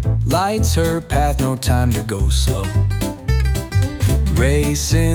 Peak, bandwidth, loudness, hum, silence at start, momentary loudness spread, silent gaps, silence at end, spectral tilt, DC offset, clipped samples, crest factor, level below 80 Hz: -4 dBFS; 19.5 kHz; -18 LUFS; none; 0 s; 3 LU; none; 0 s; -5.5 dB/octave; under 0.1%; under 0.1%; 12 dB; -22 dBFS